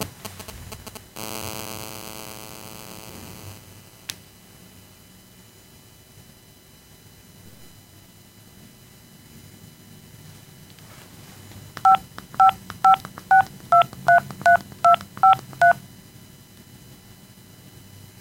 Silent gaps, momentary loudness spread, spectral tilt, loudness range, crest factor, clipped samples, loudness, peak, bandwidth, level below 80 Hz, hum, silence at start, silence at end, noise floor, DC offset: none; 24 LU; -3.5 dB/octave; 23 LU; 20 dB; under 0.1%; -19 LUFS; -4 dBFS; 17 kHz; -56 dBFS; none; 0 s; 2.45 s; -50 dBFS; under 0.1%